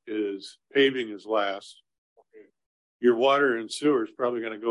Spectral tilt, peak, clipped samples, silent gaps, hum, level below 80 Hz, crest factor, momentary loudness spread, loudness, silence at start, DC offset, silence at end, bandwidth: -4 dB/octave; -10 dBFS; under 0.1%; 1.98-2.16 s, 2.66-3.00 s; none; -80 dBFS; 18 dB; 11 LU; -25 LUFS; 0.05 s; under 0.1%; 0 s; 11.5 kHz